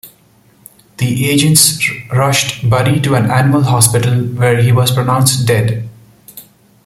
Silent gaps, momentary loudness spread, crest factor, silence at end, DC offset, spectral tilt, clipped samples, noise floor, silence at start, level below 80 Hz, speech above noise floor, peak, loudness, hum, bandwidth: none; 7 LU; 12 dB; 0.45 s; under 0.1%; -4.5 dB/octave; under 0.1%; -49 dBFS; 0.05 s; -44 dBFS; 37 dB; 0 dBFS; -11 LUFS; none; 17 kHz